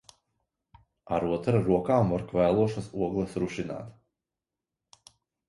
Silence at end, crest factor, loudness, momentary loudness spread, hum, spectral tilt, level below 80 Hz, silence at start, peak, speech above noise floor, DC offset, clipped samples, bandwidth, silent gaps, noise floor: 1.55 s; 20 dB; -28 LUFS; 11 LU; none; -8 dB/octave; -54 dBFS; 1.1 s; -10 dBFS; 62 dB; under 0.1%; under 0.1%; 11.5 kHz; none; -89 dBFS